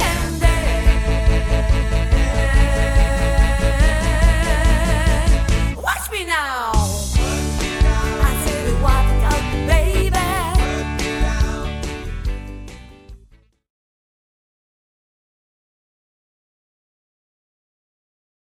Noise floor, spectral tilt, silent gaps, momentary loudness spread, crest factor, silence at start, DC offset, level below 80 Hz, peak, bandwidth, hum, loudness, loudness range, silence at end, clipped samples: -51 dBFS; -5 dB/octave; none; 5 LU; 16 dB; 0 s; under 0.1%; -20 dBFS; -2 dBFS; 15.5 kHz; none; -19 LUFS; 9 LU; 5.3 s; under 0.1%